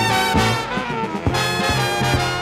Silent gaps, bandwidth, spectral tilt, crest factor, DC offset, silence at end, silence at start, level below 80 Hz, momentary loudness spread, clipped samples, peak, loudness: none; 17 kHz; -4 dB/octave; 14 dB; under 0.1%; 0 s; 0 s; -36 dBFS; 6 LU; under 0.1%; -4 dBFS; -19 LUFS